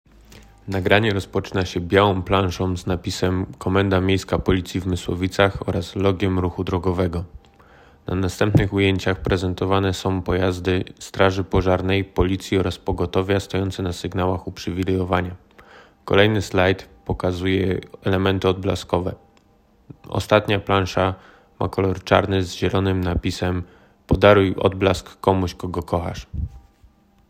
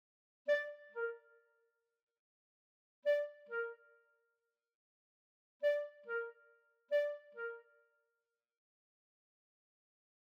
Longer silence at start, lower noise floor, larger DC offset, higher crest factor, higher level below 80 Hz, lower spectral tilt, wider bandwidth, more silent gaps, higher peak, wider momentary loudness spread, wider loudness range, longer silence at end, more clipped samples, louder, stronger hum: about the same, 0.35 s vs 0.45 s; second, -57 dBFS vs -90 dBFS; neither; about the same, 20 dB vs 18 dB; first, -40 dBFS vs under -90 dBFS; first, -6.5 dB/octave vs -1 dB/octave; first, 15 kHz vs 6.8 kHz; second, none vs 2.03-2.07 s, 2.19-3.03 s, 4.75-5.60 s; first, 0 dBFS vs -26 dBFS; about the same, 10 LU vs 10 LU; about the same, 3 LU vs 3 LU; second, 0.7 s vs 2.7 s; neither; first, -21 LUFS vs -40 LUFS; neither